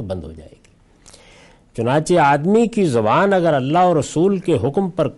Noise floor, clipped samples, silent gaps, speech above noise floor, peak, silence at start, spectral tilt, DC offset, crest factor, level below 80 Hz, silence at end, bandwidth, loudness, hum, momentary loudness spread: -50 dBFS; under 0.1%; none; 34 dB; -6 dBFS; 0 s; -6.5 dB/octave; under 0.1%; 12 dB; -50 dBFS; 0.05 s; 11.5 kHz; -16 LUFS; none; 11 LU